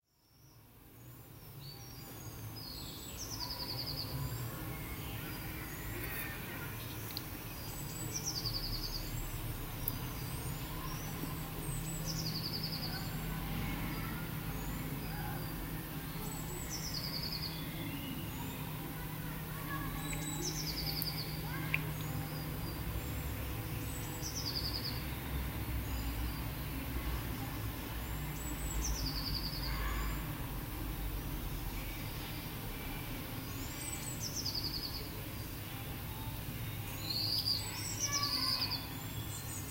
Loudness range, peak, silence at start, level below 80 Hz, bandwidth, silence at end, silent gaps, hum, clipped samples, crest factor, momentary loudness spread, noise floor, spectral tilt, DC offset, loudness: 4 LU; -14 dBFS; 0.35 s; -46 dBFS; 16 kHz; 0 s; none; none; under 0.1%; 26 dB; 6 LU; -65 dBFS; -3.5 dB/octave; under 0.1%; -39 LUFS